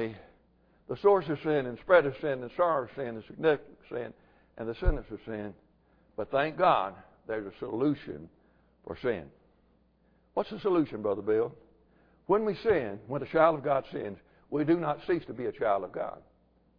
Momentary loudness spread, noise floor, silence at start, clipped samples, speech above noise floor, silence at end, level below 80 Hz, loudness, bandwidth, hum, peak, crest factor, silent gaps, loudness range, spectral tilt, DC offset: 16 LU; -67 dBFS; 0 s; under 0.1%; 37 dB; 0.6 s; -46 dBFS; -30 LUFS; 5.2 kHz; none; -8 dBFS; 22 dB; none; 6 LU; -5 dB/octave; under 0.1%